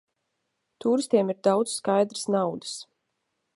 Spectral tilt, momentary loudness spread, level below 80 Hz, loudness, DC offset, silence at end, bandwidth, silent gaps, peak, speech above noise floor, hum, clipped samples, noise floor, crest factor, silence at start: -5 dB/octave; 11 LU; -78 dBFS; -25 LUFS; under 0.1%; 0.75 s; 11.5 kHz; none; -8 dBFS; 54 dB; none; under 0.1%; -79 dBFS; 20 dB; 0.85 s